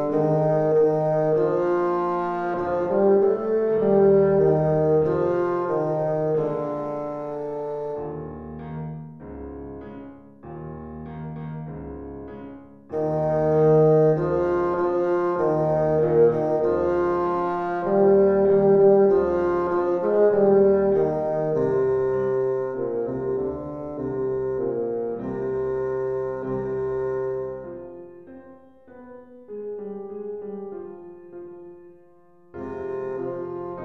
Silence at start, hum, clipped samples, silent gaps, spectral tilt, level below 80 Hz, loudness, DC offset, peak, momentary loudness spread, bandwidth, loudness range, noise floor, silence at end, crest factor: 0 s; none; under 0.1%; none; -10.5 dB/octave; -52 dBFS; -22 LUFS; under 0.1%; -6 dBFS; 20 LU; 5.8 kHz; 17 LU; -55 dBFS; 0 s; 16 dB